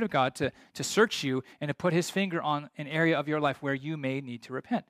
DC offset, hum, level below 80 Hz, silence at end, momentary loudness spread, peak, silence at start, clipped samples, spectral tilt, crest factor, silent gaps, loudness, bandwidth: under 0.1%; none; -70 dBFS; 0.1 s; 9 LU; -10 dBFS; 0 s; under 0.1%; -5 dB/octave; 18 dB; none; -30 LUFS; 15.5 kHz